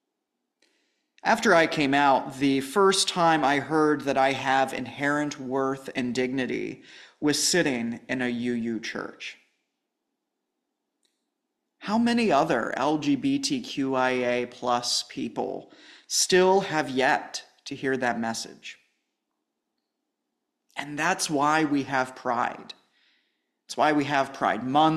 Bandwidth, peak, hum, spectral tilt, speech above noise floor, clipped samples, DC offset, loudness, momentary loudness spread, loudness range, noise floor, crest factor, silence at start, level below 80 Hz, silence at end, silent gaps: 14 kHz; -8 dBFS; none; -3.5 dB/octave; 57 dB; under 0.1%; under 0.1%; -25 LUFS; 14 LU; 11 LU; -82 dBFS; 20 dB; 1.25 s; -66 dBFS; 0 s; none